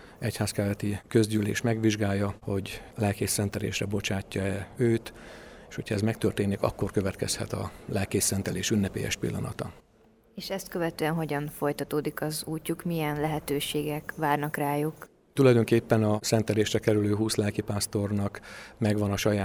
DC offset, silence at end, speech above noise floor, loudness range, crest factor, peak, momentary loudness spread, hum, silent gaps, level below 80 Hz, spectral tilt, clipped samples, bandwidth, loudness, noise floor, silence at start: under 0.1%; 0 s; 32 dB; 6 LU; 20 dB; -8 dBFS; 10 LU; none; none; -54 dBFS; -5 dB/octave; under 0.1%; over 20 kHz; -28 LUFS; -60 dBFS; 0 s